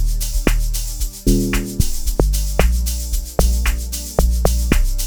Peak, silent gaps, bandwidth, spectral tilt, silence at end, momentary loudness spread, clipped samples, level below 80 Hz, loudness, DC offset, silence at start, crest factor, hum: 0 dBFS; none; over 20 kHz; -4.5 dB/octave; 0 s; 5 LU; under 0.1%; -18 dBFS; -20 LUFS; under 0.1%; 0 s; 16 dB; none